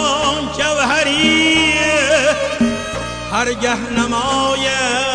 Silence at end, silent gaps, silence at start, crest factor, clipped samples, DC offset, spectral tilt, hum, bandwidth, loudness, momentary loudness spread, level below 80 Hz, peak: 0 s; none; 0 s; 12 dB; under 0.1%; under 0.1%; -2.5 dB/octave; none; 10.5 kHz; -15 LUFS; 7 LU; -38 dBFS; -4 dBFS